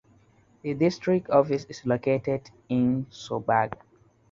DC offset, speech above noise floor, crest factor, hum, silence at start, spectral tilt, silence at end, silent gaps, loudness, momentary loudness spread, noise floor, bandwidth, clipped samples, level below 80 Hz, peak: under 0.1%; 35 dB; 20 dB; none; 0.65 s; -7.5 dB/octave; 0.55 s; none; -26 LUFS; 11 LU; -60 dBFS; 7.6 kHz; under 0.1%; -60 dBFS; -6 dBFS